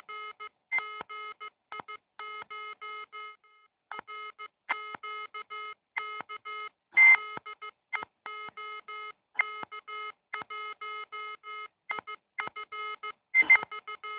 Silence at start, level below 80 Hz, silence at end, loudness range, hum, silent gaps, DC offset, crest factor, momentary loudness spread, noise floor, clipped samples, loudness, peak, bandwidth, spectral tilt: 0.1 s; -82 dBFS; 0 s; 15 LU; none; none; under 0.1%; 22 dB; 21 LU; -65 dBFS; under 0.1%; -28 LUFS; -12 dBFS; 4 kHz; 2.5 dB/octave